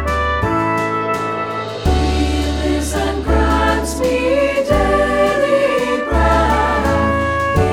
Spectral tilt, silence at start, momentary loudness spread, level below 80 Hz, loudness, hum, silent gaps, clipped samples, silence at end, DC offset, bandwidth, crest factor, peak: -5.5 dB/octave; 0 s; 5 LU; -22 dBFS; -16 LUFS; none; none; under 0.1%; 0 s; under 0.1%; 15.5 kHz; 14 dB; 0 dBFS